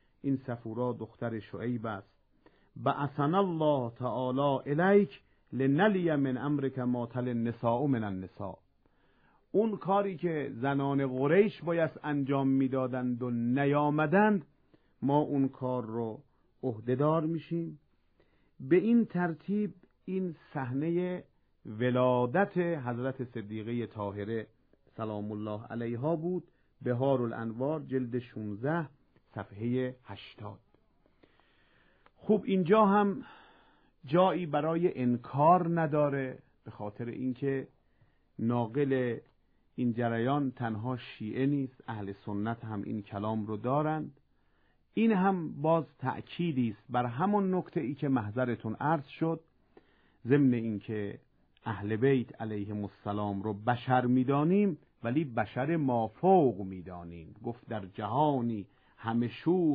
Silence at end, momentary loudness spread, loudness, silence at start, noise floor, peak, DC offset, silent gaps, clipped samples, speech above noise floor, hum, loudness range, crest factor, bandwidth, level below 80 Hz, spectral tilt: 0 s; 14 LU; -31 LUFS; 0.25 s; -69 dBFS; -12 dBFS; under 0.1%; none; under 0.1%; 38 dB; none; 6 LU; 18 dB; 4.9 kHz; -68 dBFS; -11 dB/octave